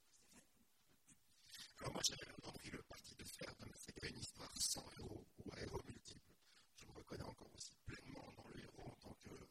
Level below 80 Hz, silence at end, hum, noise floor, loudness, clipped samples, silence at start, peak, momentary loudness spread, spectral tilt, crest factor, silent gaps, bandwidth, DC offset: -68 dBFS; 0 s; none; -78 dBFS; -51 LUFS; under 0.1%; 0.05 s; -26 dBFS; 20 LU; -2.5 dB/octave; 28 dB; none; 16 kHz; under 0.1%